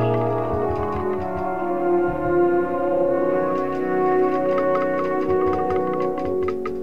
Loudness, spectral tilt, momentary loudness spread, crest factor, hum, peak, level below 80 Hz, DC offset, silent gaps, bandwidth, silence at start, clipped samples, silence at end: -22 LUFS; -9 dB/octave; 5 LU; 12 dB; none; -8 dBFS; -46 dBFS; 2%; none; 6.2 kHz; 0 s; under 0.1%; 0 s